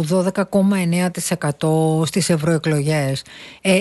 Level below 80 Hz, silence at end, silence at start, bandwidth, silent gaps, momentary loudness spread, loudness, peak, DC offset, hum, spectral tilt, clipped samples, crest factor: -54 dBFS; 0 s; 0 s; 12.5 kHz; none; 6 LU; -19 LUFS; -4 dBFS; under 0.1%; none; -5.5 dB/octave; under 0.1%; 14 dB